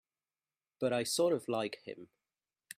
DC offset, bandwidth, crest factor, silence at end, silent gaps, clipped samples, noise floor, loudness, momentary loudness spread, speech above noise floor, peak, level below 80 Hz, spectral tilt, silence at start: under 0.1%; 15.5 kHz; 18 dB; 0.75 s; none; under 0.1%; under -90 dBFS; -34 LUFS; 17 LU; over 56 dB; -20 dBFS; -82 dBFS; -4 dB/octave; 0.8 s